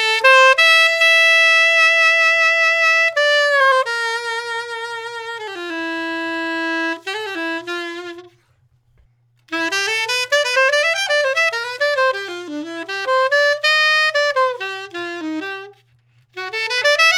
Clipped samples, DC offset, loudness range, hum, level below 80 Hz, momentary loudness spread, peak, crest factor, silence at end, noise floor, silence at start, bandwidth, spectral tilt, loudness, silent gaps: under 0.1%; under 0.1%; 12 LU; none; -70 dBFS; 17 LU; -2 dBFS; 16 dB; 0 s; -59 dBFS; 0 s; 19.5 kHz; 0 dB/octave; -15 LUFS; none